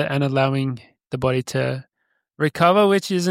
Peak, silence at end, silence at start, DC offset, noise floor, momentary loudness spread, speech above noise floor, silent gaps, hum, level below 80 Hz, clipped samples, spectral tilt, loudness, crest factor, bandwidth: -2 dBFS; 0 s; 0 s; under 0.1%; -66 dBFS; 14 LU; 46 dB; none; none; -56 dBFS; under 0.1%; -6 dB/octave; -20 LUFS; 20 dB; 16 kHz